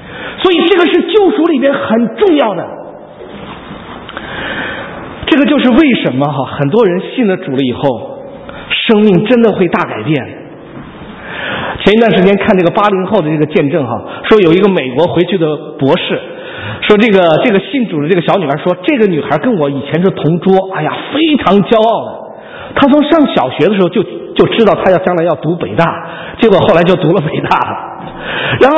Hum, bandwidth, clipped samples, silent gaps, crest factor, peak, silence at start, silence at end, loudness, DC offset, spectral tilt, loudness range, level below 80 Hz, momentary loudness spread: none; 8 kHz; 0.5%; none; 10 dB; 0 dBFS; 0 s; 0 s; -11 LUFS; under 0.1%; -8 dB/octave; 3 LU; -42 dBFS; 17 LU